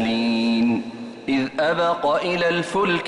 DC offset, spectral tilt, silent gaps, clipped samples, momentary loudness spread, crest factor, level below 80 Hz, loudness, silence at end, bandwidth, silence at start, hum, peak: under 0.1%; -5.5 dB/octave; none; under 0.1%; 6 LU; 10 dB; -58 dBFS; -21 LUFS; 0 s; 11 kHz; 0 s; none; -10 dBFS